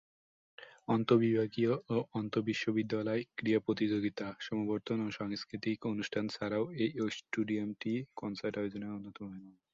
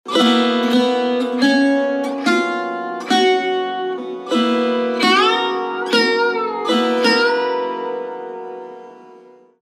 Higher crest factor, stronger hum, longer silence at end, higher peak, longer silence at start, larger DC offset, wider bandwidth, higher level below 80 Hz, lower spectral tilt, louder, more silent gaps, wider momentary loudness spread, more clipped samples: first, 22 dB vs 16 dB; neither; second, 0.2 s vs 0.45 s; second, -14 dBFS vs -2 dBFS; first, 0.6 s vs 0.05 s; neither; second, 7.6 kHz vs 14.5 kHz; first, -72 dBFS vs -82 dBFS; first, -6.5 dB/octave vs -3.5 dB/octave; second, -35 LUFS vs -17 LUFS; neither; about the same, 11 LU vs 12 LU; neither